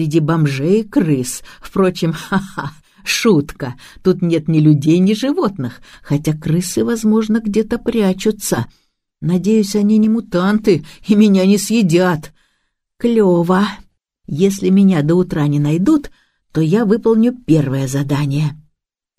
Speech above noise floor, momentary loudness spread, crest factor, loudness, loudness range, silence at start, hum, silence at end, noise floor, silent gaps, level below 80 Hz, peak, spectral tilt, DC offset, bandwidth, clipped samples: 57 dB; 10 LU; 14 dB; -15 LUFS; 3 LU; 0 s; none; 0.6 s; -71 dBFS; none; -46 dBFS; 0 dBFS; -6.5 dB/octave; under 0.1%; 15.5 kHz; under 0.1%